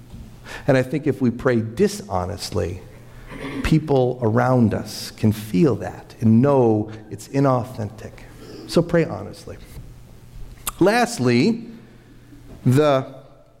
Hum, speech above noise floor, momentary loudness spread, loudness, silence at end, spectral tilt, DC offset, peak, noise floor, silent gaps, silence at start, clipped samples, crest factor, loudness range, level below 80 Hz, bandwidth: none; 26 dB; 21 LU; -20 LUFS; 0.4 s; -6.5 dB/octave; under 0.1%; -6 dBFS; -45 dBFS; none; 0.1 s; under 0.1%; 14 dB; 5 LU; -44 dBFS; 16 kHz